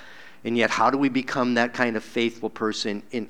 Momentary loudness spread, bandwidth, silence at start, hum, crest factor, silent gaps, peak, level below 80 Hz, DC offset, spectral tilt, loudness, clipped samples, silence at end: 8 LU; 12 kHz; 0 s; none; 22 dB; none; -2 dBFS; -68 dBFS; 0.5%; -4.5 dB/octave; -24 LUFS; under 0.1%; 0 s